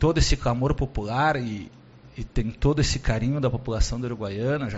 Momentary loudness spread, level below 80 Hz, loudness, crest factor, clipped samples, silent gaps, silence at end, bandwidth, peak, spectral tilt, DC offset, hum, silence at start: 10 LU; -30 dBFS; -25 LUFS; 16 dB; under 0.1%; none; 0 s; 8 kHz; -8 dBFS; -5.5 dB/octave; under 0.1%; none; 0 s